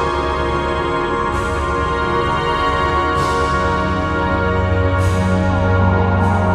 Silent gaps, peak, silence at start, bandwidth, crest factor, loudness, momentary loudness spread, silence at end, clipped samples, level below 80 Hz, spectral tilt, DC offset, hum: none; -4 dBFS; 0 s; 11.5 kHz; 12 dB; -17 LUFS; 3 LU; 0 s; under 0.1%; -26 dBFS; -6.5 dB/octave; under 0.1%; none